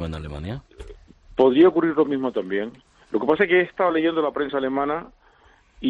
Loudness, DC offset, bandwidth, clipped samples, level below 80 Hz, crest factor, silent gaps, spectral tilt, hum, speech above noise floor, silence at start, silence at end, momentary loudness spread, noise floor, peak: -21 LUFS; under 0.1%; 5.2 kHz; under 0.1%; -48 dBFS; 18 dB; none; -8 dB/octave; none; 35 dB; 0 s; 0 s; 16 LU; -56 dBFS; -6 dBFS